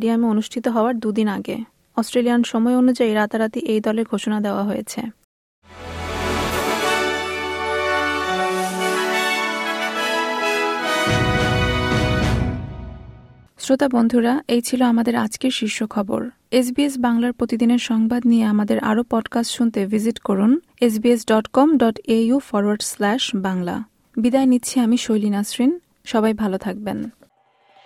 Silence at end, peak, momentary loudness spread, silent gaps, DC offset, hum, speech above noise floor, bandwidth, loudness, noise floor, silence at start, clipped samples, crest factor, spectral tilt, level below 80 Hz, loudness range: 0.75 s; -4 dBFS; 9 LU; 5.24-5.62 s; under 0.1%; none; 40 dB; 15.5 kHz; -20 LUFS; -58 dBFS; 0 s; under 0.1%; 16 dB; -5 dB/octave; -40 dBFS; 4 LU